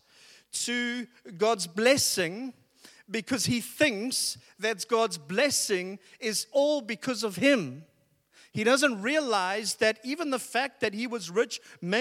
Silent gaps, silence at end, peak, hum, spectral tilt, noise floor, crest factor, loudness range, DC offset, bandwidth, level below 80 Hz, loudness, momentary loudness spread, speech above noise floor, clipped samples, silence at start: none; 0 s; -8 dBFS; none; -2.5 dB/octave; -63 dBFS; 22 dB; 2 LU; under 0.1%; 16.5 kHz; -74 dBFS; -28 LUFS; 12 LU; 35 dB; under 0.1%; 0.55 s